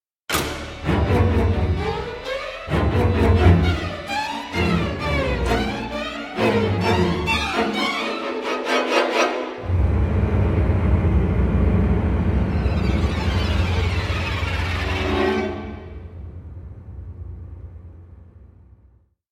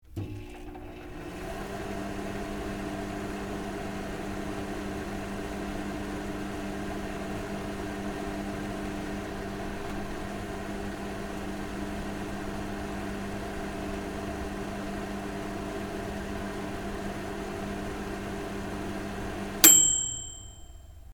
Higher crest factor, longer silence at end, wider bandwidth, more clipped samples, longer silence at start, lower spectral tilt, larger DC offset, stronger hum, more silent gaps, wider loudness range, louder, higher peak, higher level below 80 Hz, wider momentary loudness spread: second, 18 dB vs 32 dB; first, 0.9 s vs 0 s; second, 15.5 kHz vs 17.5 kHz; neither; first, 0.3 s vs 0.05 s; first, -6.5 dB/octave vs -2.5 dB/octave; neither; neither; neither; second, 7 LU vs 13 LU; first, -21 LUFS vs -30 LUFS; about the same, -2 dBFS vs 0 dBFS; first, -28 dBFS vs -44 dBFS; first, 18 LU vs 2 LU